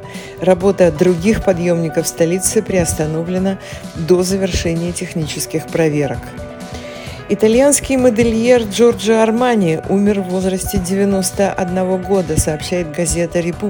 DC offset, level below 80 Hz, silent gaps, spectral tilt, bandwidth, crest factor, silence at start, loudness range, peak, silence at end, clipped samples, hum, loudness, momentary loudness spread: under 0.1%; -34 dBFS; none; -5 dB/octave; 18 kHz; 16 dB; 0 s; 5 LU; 0 dBFS; 0 s; under 0.1%; none; -15 LUFS; 10 LU